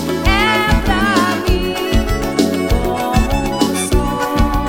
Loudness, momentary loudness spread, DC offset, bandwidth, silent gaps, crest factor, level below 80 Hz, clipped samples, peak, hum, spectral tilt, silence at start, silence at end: -16 LUFS; 4 LU; under 0.1%; 18.5 kHz; none; 14 dB; -20 dBFS; under 0.1%; 0 dBFS; none; -5 dB/octave; 0 s; 0 s